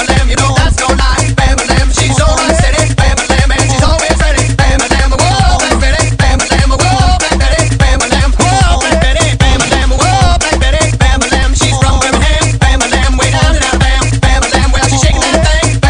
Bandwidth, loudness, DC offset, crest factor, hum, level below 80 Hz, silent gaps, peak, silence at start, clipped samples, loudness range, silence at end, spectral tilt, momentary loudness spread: 10.5 kHz; -9 LUFS; under 0.1%; 8 dB; none; -12 dBFS; none; 0 dBFS; 0 s; 0.5%; 0 LU; 0 s; -4 dB/octave; 1 LU